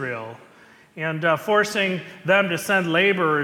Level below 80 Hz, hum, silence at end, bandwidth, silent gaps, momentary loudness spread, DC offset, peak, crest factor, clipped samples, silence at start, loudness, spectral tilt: -68 dBFS; none; 0 s; 18 kHz; none; 11 LU; under 0.1%; -4 dBFS; 18 dB; under 0.1%; 0 s; -21 LUFS; -4.5 dB/octave